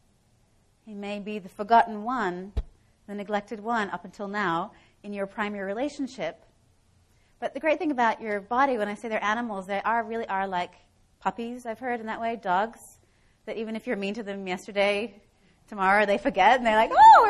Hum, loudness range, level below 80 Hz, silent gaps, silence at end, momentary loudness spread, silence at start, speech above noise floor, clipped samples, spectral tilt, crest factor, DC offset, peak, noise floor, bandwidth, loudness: none; 6 LU; -50 dBFS; none; 0 s; 15 LU; 0.85 s; 39 dB; under 0.1%; -5 dB/octave; 20 dB; under 0.1%; -6 dBFS; -64 dBFS; 12 kHz; -26 LUFS